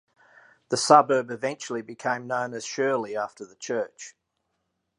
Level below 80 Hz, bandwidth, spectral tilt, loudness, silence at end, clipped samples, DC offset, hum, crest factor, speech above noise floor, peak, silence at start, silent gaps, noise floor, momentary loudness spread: -78 dBFS; 11 kHz; -3.5 dB/octave; -25 LUFS; 0.9 s; under 0.1%; under 0.1%; none; 24 dB; 52 dB; -2 dBFS; 0.7 s; none; -78 dBFS; 17 LU